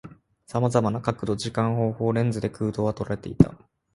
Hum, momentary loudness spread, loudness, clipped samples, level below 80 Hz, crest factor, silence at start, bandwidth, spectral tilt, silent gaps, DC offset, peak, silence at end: none; 6 LU; -25 LUFS; under 0.1%; -48 dBFS; 24 dB; 0.05 s; 11.5 kHz; -7.5 dB/octave; none; under 0.1%; 0 dBFS; 0.4 s